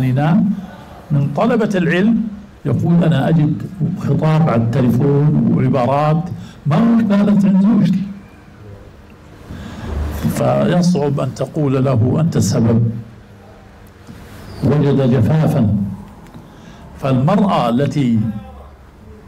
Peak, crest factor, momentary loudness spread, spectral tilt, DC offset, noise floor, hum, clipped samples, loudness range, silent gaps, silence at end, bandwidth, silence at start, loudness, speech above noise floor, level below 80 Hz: -6 dBFS; 8 dB; 13 LU; -8 dB/octave; under 0.1%; -40 dBFS; none; under 0.1%; 4 LU; none; 0.1 s; 14 kHz; 0 s; -15 LUFS; 26 dB; -38 dBFS